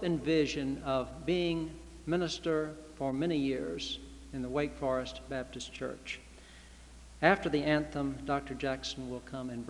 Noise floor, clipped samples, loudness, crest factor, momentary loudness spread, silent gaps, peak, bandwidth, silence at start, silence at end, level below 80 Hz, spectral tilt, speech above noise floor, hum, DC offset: -53 dBFS; under 0.1%; -34 LUFS; 26 dB; 14 LU; none; -8 dBFS; 12 kHz; 0 s; 0 s; -52 dBFS; -5.5 dB/octave; 20 dB; none; under 0.1%